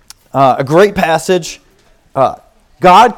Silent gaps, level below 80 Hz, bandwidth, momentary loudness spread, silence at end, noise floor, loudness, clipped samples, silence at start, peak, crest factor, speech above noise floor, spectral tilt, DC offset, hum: none; -42 dBFS; 18 kHz; 14 LU; 0.05 s; -49 dBFS; -11 LUFS; 1%; 0.35 s; 0 dBFS; 12 dB; 39 dB; -5 dB/octave; under 0.1%; none